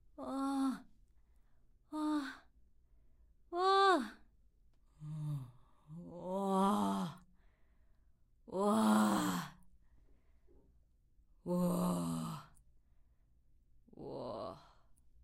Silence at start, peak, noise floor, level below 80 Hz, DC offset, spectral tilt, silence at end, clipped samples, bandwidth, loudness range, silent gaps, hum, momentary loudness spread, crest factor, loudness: 0.2 s; -20 dBFS; -69 dBFS; -68 dBFS; under 0.1%; -5.5 dB/octave; 0.65 s; under 0.1%; 16 kHz; 6 LU; none; none; 20 LU; 20 dB; -36 LUFS